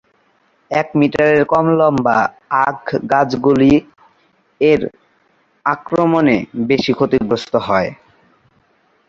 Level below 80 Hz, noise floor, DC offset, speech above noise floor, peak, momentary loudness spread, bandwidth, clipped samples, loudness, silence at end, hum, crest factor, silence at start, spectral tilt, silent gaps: -48 dBFS; -58 dBFS; under 0.1%; 44 dB; 0 dBFS; 8 LU; 7.6 kHz; under 0.1%; -15 LUFS; 1.15 s; none; 16 dB; 0.7 s; -7 dB/octave; none